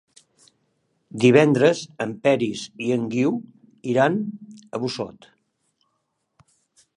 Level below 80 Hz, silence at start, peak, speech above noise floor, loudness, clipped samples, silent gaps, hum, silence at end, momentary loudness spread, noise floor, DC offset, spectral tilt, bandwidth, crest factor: -68 dBFS; 1.15 s; -2 dBFS; 53 dB; -21 LUFS; under 0.1%; none; none; 1.85 s; 18 LU; -74 dBFS; under 0.1%; -6 dB/octave; 11 kHz; 22 dB